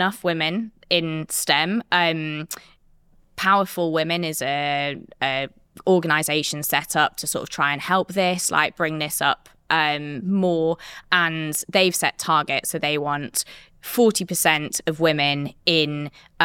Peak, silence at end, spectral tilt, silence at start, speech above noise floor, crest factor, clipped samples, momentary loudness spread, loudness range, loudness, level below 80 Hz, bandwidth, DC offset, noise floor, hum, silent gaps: -2 dBFS; 0 s; -3 dB/octave; 0 s; 33 dB; 22 dB; under 0.1%; 8 LU; 2 LU; -21 LUFS; -60 dBFS; 18.5 kHz; under 0.1%; -55 dBFS; none; none